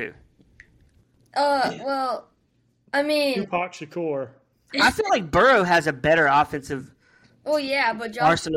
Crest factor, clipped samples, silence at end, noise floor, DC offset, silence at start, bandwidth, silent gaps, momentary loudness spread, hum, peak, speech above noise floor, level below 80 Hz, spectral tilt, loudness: 16 dB; under 0.1%; 0 s; -66 dBFS; under 0.1%; 0 s; 16 kHz; none; 14 LU; none; -8 dBFS; 44 dB; -52 dBFS; -4.5 dB/octave; -22 LUFS